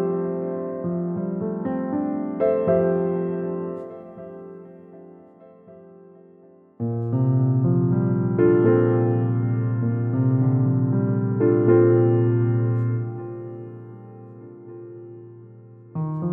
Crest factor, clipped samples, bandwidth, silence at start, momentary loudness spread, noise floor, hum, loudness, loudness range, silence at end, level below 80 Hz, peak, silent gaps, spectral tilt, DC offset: 16 dB; under 0.1%; 3 kHz; 0 s; 22 LU; -51 dBFS; none; -22 LUFS; 14 LU; 0 s; -62 dBFS; -6 dBFS; none; -14 dB/octave; under 0.1%